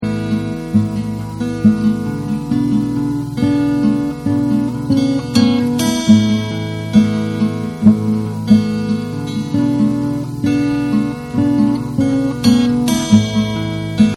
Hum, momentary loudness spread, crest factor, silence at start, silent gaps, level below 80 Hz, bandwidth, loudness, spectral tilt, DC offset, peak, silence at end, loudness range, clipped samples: none; 7 LU; 14 dB; 0 s; none; -42 dBFS; 13.5 kHz; -16 LUFS; -6.5 dB/octave; under 0.1%; 0 dBFS; 0 s; 2 LU; under 0.1%